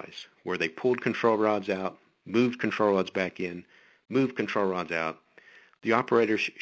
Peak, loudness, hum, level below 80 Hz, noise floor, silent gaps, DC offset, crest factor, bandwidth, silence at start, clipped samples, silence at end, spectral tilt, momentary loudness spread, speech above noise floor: -8 dBFS; -28 LUFS; none; -68 dBFS; -56 dBFS; none; under 0.1%; 20 dB; 8 kHz; 0 s; under 0.1%; 0 s; -6 dB/octave; 12 LU; 28 dB